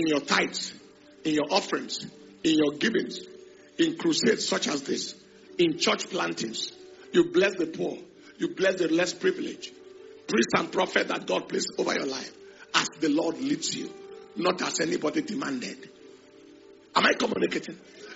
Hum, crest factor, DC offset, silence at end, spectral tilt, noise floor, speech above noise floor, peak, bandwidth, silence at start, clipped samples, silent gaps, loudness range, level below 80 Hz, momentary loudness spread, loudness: none; 22 dB; under 0.1%; 0 s; -2.5 dB/octave; -52 dBFS; 25 dB; -6 dBFS; 8 kHz; 0 s; under 0.1%; none; 2 LU; -70 dBFS; 16 LU; -27 LUFS